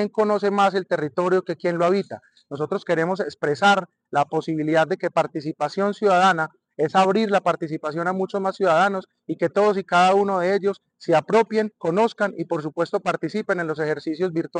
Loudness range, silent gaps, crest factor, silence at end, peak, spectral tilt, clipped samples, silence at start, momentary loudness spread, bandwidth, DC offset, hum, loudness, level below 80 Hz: 2 LU; none; 12 dB; 0 s; -10 dBFS; -6 dB/octave; under 0.1%; 0 s; 9 LU; 9.8 kHz; under 0.1%; none; -22 LUFS; -72 dBFS